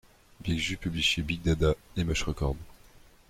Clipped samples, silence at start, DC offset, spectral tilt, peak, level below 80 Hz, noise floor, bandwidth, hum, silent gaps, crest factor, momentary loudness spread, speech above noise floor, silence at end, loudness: under 0.1%; 0.4 s; under 0.1%; -4.5 dB/octave; -14 dBFS; -40 dBFS; -55 dBFS; 15.5 kHz; none; none; 16 dB; 7 LU; 27 dB; 0.55 s; -29 LUFS